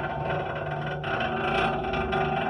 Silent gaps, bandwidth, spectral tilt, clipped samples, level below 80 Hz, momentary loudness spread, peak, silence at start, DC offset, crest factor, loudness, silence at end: none; 10.5 kHz; -7 dB/octave; under 0.1%; -44 dBFS; 6 LU; -12 dBFS; 0 s; under 0.1%; 16 dB; -28 LUFS; 0 s